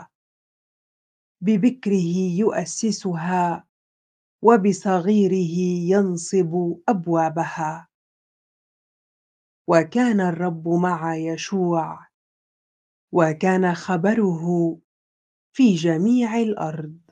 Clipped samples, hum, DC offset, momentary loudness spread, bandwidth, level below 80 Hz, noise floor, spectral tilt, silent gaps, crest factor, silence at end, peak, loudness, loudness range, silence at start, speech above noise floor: under 0.1%; none; under 0.1%; 9 LU; 9.6 kHz; -72 dBFS; under -90 dBFS; -6.5 dB/octave; 0.15-1.35 s, 3.69-4.39 s, 7.94-9.65 s, 12.14-13.08 s, 14.84-15.52 s; 22 dB; 0.15 s; 0 dBFS; -21 LUFS; 4 LU; 0 s; over 70 dB